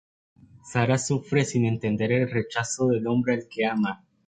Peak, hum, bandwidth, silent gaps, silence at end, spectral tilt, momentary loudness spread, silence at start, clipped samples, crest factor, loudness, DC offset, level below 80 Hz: -8 dBFS; none; 9.4 kHz; none; 0.3 s; -5.5 dB/octave; 4 LU; 0.65 s; under 0.1%; 18 dB; -25 LUFS; under 0.1%; -60 dBFS